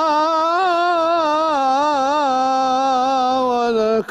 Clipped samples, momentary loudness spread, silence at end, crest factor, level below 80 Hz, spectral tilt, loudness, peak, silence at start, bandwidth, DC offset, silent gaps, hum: under 0.1%; 1 LU; 0.05 s; 10 dB; -58 dBFS; -3.5 dB/octave; -17 LUFS; -8 dBFS; 0 s; 11.5 kHz; under 0.1%; none; none